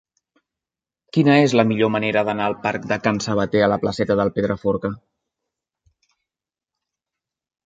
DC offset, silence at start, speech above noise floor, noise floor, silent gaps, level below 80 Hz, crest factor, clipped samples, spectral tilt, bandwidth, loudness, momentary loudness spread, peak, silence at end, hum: under 0.1%; 1.15 s; 70 dB; -89 dBFS; none; -54 dBFS; 20 dB; under 0.1%; -6 dB/octave; 9.2 kHz; -19 LUFS; 9 LU; -2 dBFS; 2.65 s; none